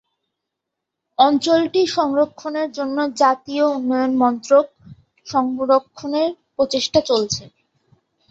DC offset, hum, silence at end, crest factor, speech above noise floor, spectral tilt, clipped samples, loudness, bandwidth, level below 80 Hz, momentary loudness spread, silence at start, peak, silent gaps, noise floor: under 0.1%; none; 0.85 s; 18 dB; 63 dB; -4 dB/octave; under 0.1%; -19 LUFS; 8 kHz; -58 dBFS; 8 LU; 1.2 s; -2 dBFS; none; -81 dBFS